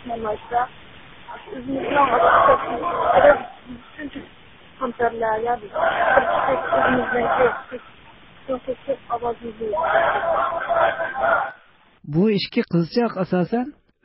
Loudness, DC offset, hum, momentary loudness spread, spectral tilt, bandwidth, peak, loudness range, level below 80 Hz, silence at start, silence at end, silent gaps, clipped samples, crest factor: -20 LUFS; 0.2%; none; 19 LU; -10.5 dB/octave; 5.8 kHz; 0 dBFS; 4 LU; -50 dBFS; 0 s; 0.35 s; none; under 0.1%; 20 dB